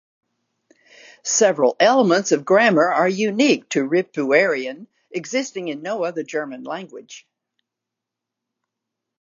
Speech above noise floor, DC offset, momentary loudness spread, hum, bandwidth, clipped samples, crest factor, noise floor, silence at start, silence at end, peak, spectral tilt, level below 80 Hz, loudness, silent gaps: 65 dB; under 0.1%; 16 LU; none; 7.6 kHz; under 0.1%; 20 dB; -84 dBFS; 1.25 s; 2 s; -2 dBFS; -3.5 dB/octave; -80 dBFS; -19 LUFS; none